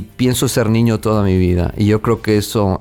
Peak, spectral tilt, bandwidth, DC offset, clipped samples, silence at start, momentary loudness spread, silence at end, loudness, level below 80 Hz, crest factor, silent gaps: -2 dBFS; -6 dB/octave; 18 kHz; 0.2%; under 0.1%; 0 s; 2 LU; 0 s; -15 LUFS; -34 dBFS; 12 dB; none